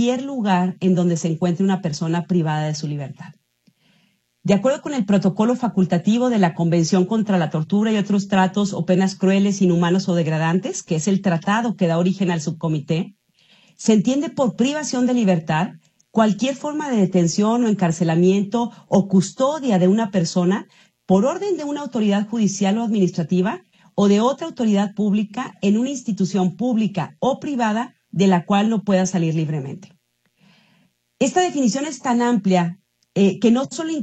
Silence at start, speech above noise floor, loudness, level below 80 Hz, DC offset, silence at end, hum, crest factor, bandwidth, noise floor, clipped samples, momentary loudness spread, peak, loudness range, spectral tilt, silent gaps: 0 s; 45 dB; -20 LUFS; -64 dBFS; under 0.1%; 0 s; none; 16 dB; 8.6 kHz; -63 dBFS; under 0.1%; 7 LU; -4 dBFS; 4 LU; -6 dB/octave; none